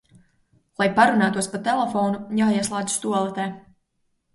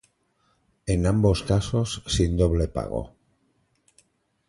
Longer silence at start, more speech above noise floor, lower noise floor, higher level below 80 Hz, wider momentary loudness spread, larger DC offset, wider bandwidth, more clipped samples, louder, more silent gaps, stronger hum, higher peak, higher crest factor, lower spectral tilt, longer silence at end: about the same, 0.8 s vs 0.85 s; first, 50 dB vs 46 dB; about the same, -71 dBFS vs -68 dBFS; second, -64 dBFS vs -34 dBFS; about the same, 10 LU vs 11 LU; neither; about the same, 11.5 kHz vs 11.5 kHz; neither; about the same, -22 LUFS vs -24 LUFS; neither; neither; first, -2 dBFS vs -6 dBFS; about the same, 20 dB vs 18 dB; second, -4.5 dB/octave vs -6 dB/octave; second, 0.75 s vs 1.4 s